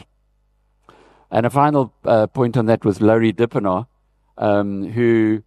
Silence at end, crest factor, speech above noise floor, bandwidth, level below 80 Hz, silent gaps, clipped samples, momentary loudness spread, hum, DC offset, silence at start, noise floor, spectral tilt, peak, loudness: 0.05 s; 18 dB; 45 dB; 13 kHz; -56 dBFS; none; under 0.1%; 7 LU; 50 Hz at -50 dBFS; under 0.1%; 1.3 s; -62 dBFS; -8.5 dB/octave; -2 dBFS; -18 LUFS